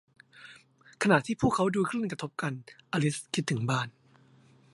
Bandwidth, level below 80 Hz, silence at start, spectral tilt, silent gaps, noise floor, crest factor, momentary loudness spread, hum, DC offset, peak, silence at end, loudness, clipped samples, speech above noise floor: 11.5 kHz; -60 dBFS; 0.35 s; -5.5 dB/octave; none; -60 dBFS; 24 dB; 17 LU; none; under 0.1%; -8 dBFS; 0.85 s; -30 LUFS; under 0.1%; 31 dB